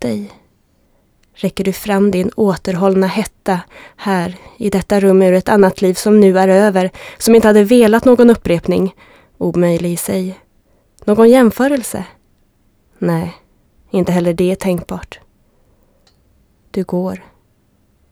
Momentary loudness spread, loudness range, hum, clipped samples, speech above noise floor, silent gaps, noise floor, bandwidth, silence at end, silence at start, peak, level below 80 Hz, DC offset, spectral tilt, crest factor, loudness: 15 LU; 10 LU; none; under 0.1%; 44 dB; none; -56 dBFS; over 20 kHz; 0.95 s; 0 s; 0 dBFS; -44 dBFS; under 0.1%; -6.5 dB/octave; 14 dB; -13 LUFS